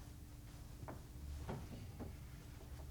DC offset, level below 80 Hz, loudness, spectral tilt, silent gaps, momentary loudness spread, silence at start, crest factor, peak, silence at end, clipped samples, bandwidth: under 0.1%; -56 dBFS; -53 LUFS; -6 dB/octave; none; 7 LU; 0 s; 18 dB; -32 dBFS; 0 s; under 0.1%; over 20 kHz